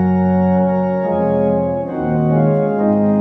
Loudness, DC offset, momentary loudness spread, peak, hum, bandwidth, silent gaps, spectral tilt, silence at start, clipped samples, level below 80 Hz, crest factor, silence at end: -16 LUFS; under 0.1%; 4 LU; -4 dBFS; none; 3.8 kHz; none; -12 dB/octave; 0 s; under 0.1%; -46 dBFS; 12 dB; 0 s